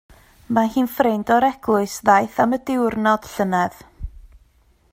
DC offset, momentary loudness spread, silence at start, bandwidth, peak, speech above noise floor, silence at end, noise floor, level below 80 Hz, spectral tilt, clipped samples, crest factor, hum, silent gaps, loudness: under 0.1%; 12 LU; 0.5 s; 16 kHz; 0 dBFS; 38 dB; 0.65 s; -57 dBFS; -44 dBFS; -5.5 dB/octave; under 0.1%; 20 dB; none; none; -19 LUFS